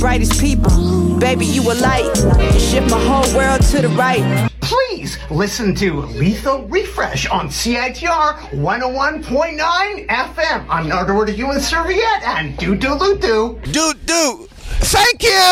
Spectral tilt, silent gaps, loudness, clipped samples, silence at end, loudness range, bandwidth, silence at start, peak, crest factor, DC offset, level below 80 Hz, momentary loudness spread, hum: -4.5 dB/octave; none; -15 LUFS; under 0.1%; 0 s; 4 LU; 16.5 kHz; 0 s; -2 dBFS; 12 dB; under 0.1%; -24 dBFS; 6 LU; none